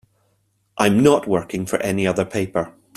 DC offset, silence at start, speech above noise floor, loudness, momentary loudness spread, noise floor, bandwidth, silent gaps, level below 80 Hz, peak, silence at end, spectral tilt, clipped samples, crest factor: under 0.1%; 0.75 s; 47 dB; -19 LUFS; 9 LU; -66 dBFS; 14 kHz; none; -54 dBFS; -2 dBFS; 0.25 s; -5.5 dB/octave; under 0.1%; 18 dB